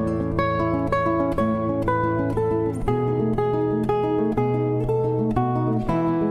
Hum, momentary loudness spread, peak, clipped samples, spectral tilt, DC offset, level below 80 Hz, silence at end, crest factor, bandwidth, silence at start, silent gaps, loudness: none; 1 LU; -8 dBFS; under 0.1%; -9.5 dB/octave; under 0.1%; -38 dBFS; 0 s; 14 dB; 10.5 kHz; 0 s; none; -23 LUFS